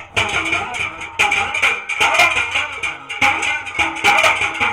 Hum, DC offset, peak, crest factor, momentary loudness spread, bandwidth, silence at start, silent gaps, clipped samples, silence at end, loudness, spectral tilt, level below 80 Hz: none; under 0.1%; -4 dBFS; 14 dB; 10 LU; 17 kHz; 0 s; none; under 0.1%; 0 s; -16 LUFS; -1.5 dB/octave; -46 dBFS